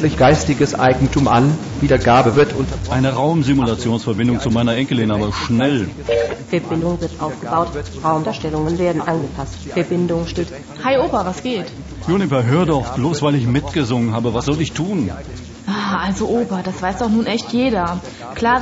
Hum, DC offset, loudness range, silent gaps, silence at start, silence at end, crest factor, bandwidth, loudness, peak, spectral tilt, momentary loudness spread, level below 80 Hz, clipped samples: none; under 0.1%; 5 LU; none; 0 s; 0 s; 14 dB; 8 kHz; -18 LUFS; -2 dBFS; -6.5 dB/octave; 9 LU; -36 dBFS; under 0.1%